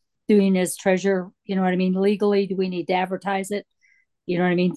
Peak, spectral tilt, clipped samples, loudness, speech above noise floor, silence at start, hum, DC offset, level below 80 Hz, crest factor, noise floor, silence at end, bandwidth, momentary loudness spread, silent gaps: -6 dBFS; -6 dB/octave; under 0.1%; -22 LUFS; 42 dB; 0.3 s; none; under 0.1%; -68 dBFS; 16 dB; -63 dBFS; 0 s; 12.5 kHz; 9 LU; none